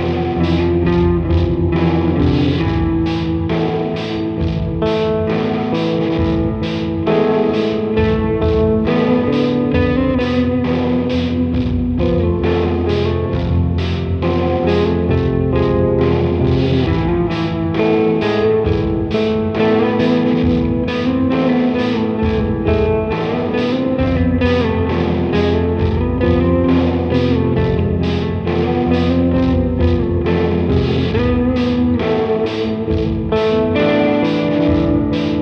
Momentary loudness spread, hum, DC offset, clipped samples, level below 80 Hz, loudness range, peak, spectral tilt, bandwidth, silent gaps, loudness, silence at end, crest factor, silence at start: 4 LU; none; under 0.1%; under 0.1%; -30 dBFS; 2 LU; -2 dBFS; -9 dB/octave; 6.6 kHz; none; -16 LUFS; 0 s; 12 dB; 0 s